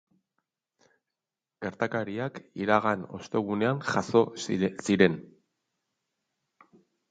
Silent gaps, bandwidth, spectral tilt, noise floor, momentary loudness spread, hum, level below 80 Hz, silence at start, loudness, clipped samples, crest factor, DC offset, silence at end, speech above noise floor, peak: none; 9.4 kHz; -6 dB/octave; -89 dBFS; 12 LU; none; -64 dBFS; 1.6 s; -28 LUFS; under 0.1%; 24 dB; under 0.1%; 1.9 s; 62 dB; -6 dBFS